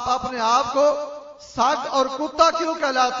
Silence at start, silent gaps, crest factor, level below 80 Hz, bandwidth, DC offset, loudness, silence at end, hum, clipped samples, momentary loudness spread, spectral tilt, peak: 0 s; none; 20 dB; -54 dBFS; 7.8 kHz; under 0.1%; -20 LUFS; 0 s; none; under 0.1%; 11 LU; -2.5 dB/octave; -2 dBFS